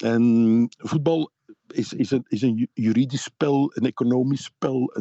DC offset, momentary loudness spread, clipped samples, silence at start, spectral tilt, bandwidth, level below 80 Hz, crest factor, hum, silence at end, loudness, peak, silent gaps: under 0.1%; 8 LU; under 0.1%; 0 s; -7 dB/octave; 8.2 kHz; -68 dBFS; 12 dB; none; 0 s; -23 LUFS; -10 dBFS; none